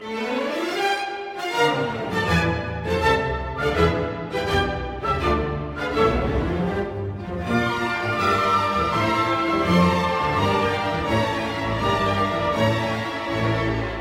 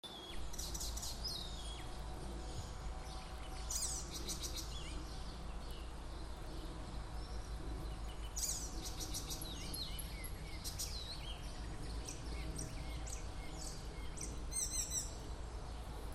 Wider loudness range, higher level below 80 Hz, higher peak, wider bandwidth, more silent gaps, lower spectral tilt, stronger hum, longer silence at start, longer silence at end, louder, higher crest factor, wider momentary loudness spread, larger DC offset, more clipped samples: about the same, 3 LU vs 4 LU; first, -36 dBFS vs -48 dBFS; first, -4 dBFS vs -26 dBFS; about the same, 16.5 kHz vs 15.5 kHz; neither; first, -6 dB/octave vs -3 dB/octave; neither; about the same, 0 s vs 0.05 s; about the same, 0 s vs 0 s; first, -22 LUFS vs -45 LUFS; about the same, 18 dB vs 18 dB; about the same, 7 LU vs 9 LU; neither; neither